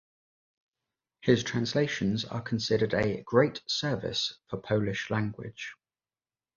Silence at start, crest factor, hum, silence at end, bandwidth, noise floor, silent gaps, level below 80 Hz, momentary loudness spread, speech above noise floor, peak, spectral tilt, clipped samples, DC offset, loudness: 1.25 s; 22 dB; none; 0.85 s; 7.4 kHz; under -90 dBFS; none; -58 dBFS; 11 LU; over 61 dB; -8 dBFS; -5.5 dB/octave; under 0.1%; under 0.1%; -29 LUFS